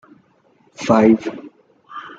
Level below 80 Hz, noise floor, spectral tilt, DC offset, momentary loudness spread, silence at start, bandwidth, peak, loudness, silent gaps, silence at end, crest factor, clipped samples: -54 dBFS; -57 dBFS; -6.5 dB/octave; under 0.1%; 24 LU; 0.8 s; 7.8 kHz; -2 dBFS; -16 LUFS; none; 0.1 s; 18 dB; under 0.1%